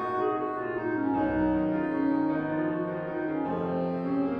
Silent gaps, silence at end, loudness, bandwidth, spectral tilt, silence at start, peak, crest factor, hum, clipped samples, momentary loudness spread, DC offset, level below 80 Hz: none; 0 s; -29 LUFS; 5 kHz; -10 dB/octave; 0 s; -14 dBFS; 14 dB; none; under 0.1%; 5 LU; under 0.1%; -54 dBFS